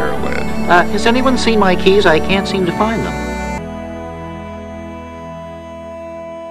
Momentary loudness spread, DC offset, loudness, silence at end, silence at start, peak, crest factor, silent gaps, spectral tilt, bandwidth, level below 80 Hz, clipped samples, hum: 18 LU; under 0.1%; -14 LUFS; 0 s; 0 s; 0 dBFS; 16 dB; none; -5 dB/octave; 15 kHz; -32 dBFS; under 0.1%; none